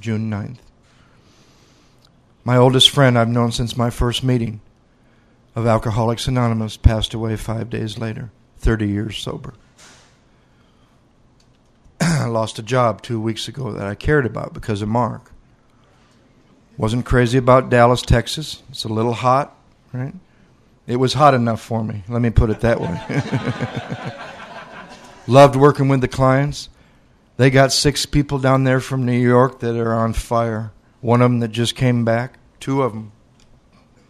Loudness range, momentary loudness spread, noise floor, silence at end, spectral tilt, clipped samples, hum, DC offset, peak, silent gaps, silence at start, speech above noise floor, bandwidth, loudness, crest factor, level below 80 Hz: 7 LU; 17 LU; -54 dBFS; 1 s; -5.5 dB/octave; under 0.1%; none; under 0.1%; 0 dBFS; none; 0.05 s; 37 dB; 13.5 kHz; -18 LUFS; 18 dB; -34 dBFS